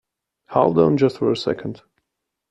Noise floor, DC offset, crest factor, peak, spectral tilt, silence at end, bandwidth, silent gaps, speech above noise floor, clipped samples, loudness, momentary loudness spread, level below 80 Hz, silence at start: -80 dBFS; under 0.1%; 18 dB; -2 dBFS; -7.5 dB/octave; 0.75 s; 8.6 kHz; none; 61 dB; under 0.1%; -19 LUFS; 11 LU; -56 dBFS; 0.5 s